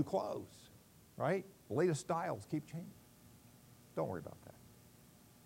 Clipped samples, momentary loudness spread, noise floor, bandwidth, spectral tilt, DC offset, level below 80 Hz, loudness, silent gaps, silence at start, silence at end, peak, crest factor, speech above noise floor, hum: under 0.1%; 26 LU; -63 dBFS; 16 kHz; -6.5 dB/octave; under 0.1%; -74 dBFS; -40 LUFS; none; 0 s; 0.4 s; -22 dBFS; 20 dB; 24 dB; none